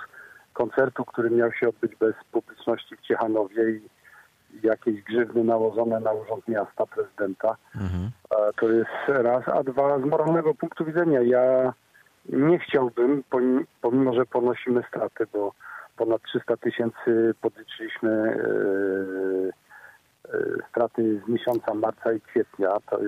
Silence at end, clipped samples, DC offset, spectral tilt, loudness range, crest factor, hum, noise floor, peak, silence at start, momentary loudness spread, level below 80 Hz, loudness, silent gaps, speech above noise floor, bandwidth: 0 s; under 0.1%; under 0.1%; -8 dB/octave; 4 LU; 14 dB; none; -54 dBFS; -10 dBFS; 0 s; 8 LU; -62 dBFS; -25 LUFS; none; 30 dB; 14 kHz